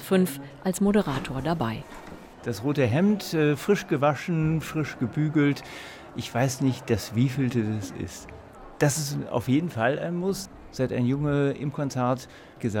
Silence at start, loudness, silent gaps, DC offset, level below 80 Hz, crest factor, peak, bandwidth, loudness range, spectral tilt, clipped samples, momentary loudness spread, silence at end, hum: 0 s; -26 LUFS; none; under 0.1%; -52 dBFS; 18 dB; -8 dBFS; 17.5 kHz; 3 LU; -6 dB/octave; under 0.1%; 14 LU; 0 s; none